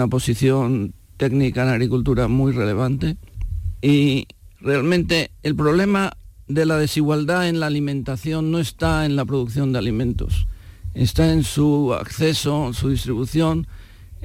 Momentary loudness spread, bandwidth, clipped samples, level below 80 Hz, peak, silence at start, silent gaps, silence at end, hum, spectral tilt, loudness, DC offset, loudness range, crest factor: 8 LU; 16.5 kHz; under 0.1%; -34 dBFS; -6 dBFS; 0 s; none; 0 s; none; -6.5 dB/octave; -20 LUFS; under 0.1%; 2 LU; 14 dB